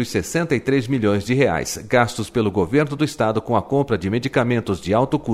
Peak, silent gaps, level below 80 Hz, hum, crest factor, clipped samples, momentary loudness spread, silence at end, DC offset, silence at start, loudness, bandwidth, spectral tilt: -2 dBFS; none; -46 dBFS; none; 18 dB; under 0.1%; 3 LU; 0 s; under 0.1%; 0 s; -20 LUFS; 15.5 kHz; -6 dB/octave